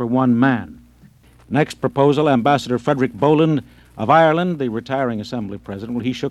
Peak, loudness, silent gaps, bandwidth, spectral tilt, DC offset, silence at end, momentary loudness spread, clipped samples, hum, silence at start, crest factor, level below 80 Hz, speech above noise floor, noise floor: -2 dBFS; -18 LUFS; none; 12.5 kHz; -7 dB/octave; under 0.1%; 0 s; 12 LU; under 0.1%; none; 0 s; 16 dB; -52 dBFS; 31 dB; -49 dBFS